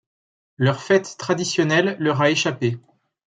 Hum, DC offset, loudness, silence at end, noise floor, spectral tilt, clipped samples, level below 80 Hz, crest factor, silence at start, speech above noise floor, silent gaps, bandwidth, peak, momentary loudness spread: none; under 0.1%; -20 LUFS; 0.5 s; under -90 dBFS; -5 dB/octave; under 0.1%; -66 dBFS; 18 dB; 0.6 s; over 70 dB; none; 9.4 kHz; -4 dBFS; 7 LU